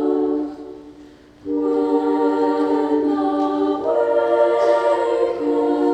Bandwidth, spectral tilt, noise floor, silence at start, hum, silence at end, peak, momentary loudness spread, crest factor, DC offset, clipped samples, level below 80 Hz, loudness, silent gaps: 8.8 kHz; -6 dB/octave; -44 dBFS; 0 s; none; 0 s; -6 dBFS; 9 LU; 12 dB; under 0.1%; under 0.1%; -58 dBFS; -19 LUFS; none